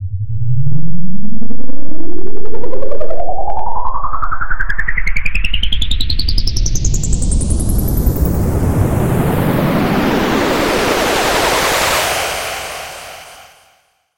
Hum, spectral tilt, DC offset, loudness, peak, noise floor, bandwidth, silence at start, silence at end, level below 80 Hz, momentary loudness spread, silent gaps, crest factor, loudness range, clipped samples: none; -4.5 dB/octave; under 0.1%; -17 LUFS; 0 dBFS; -55 dBFS; 17 kHz; 0 s; 0 s; -22 dBFS; 14 LU; none; 10 dB; 9 LU; 2%